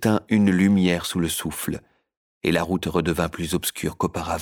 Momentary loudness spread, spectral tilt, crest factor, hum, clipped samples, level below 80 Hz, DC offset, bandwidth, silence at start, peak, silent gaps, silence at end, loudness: 10 LU; -5 dB/octave; 16 dB; none; under 0.1%; -46 dBFS; under 0.1%; over 20 kHz; 0 s; -6 dBFS; 2.17-2.41 s; 0 s; -23 LUFS